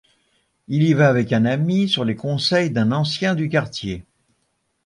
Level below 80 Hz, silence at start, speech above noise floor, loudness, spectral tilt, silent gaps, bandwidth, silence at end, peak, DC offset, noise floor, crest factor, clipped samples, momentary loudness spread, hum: -52 dBFS; 0.7 s; 51 dB; -19 LUFS; -6.5 dB/octave; none; 11 kHz; 0.85 s; -4 dBFS; under 0.1%; -70 dBFS; 16 dB; under 0.1%; 11 LU; none